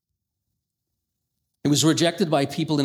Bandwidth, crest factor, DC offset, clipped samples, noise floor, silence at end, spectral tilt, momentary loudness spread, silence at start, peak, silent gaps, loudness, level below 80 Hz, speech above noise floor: 16 kHz; 18 dB; under 0.1%; under 0.1%; -81 dBFS; 0 s; -4.5 dB/octave; 5 LU; 1.65 s; -6 dBFS; none; -21 LUFS; -66 dBFS; 60 dB